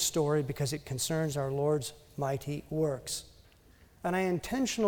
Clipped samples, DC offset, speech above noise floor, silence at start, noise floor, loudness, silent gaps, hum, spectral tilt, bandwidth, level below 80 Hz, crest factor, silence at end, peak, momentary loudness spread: under 0.1%; under 0.1%; 28 dB; 0 s; -60 dBFS; -33 LUFS; none; none; -4.5 dB/octave; over 20 kHz; -58 dBFS; 16 dB; 0 s; -16 dBFS; 7 LU